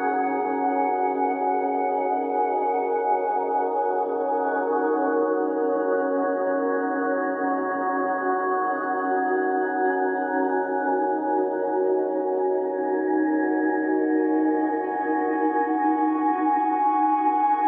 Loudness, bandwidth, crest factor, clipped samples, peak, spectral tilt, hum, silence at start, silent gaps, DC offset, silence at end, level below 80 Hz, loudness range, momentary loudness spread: -24 LUFS; 3.6 kHz; 12 dB; under 0.1%; -12 dBFS; -9.5 dB/octave; none; 0 s; none; under 0.1%; 0 s; -74 dBFS; 1 LU; 3 LU